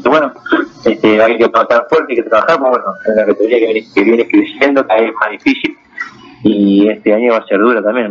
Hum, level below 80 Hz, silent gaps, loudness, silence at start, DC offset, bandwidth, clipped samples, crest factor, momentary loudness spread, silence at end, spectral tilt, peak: none; -54 dBFS; none; -11 LUFS; 0 s; under 0.1%; 7 kHz; under 0.1%; 12 dB; 6 LU; 0 s; -6.5 dB/octave; 0 dBFS